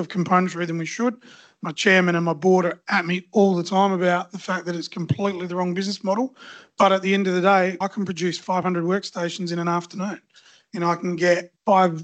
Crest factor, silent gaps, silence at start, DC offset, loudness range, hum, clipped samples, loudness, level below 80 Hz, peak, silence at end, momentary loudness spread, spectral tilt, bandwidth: 18 dB; none; 0 s; under 0.1%; 4 LU; none; under 0.1%; -22 LUFS; -68 dBFS; -4 dBFS; 0 s; 11 LU; -5.5 dB/octave; 8.6 kHz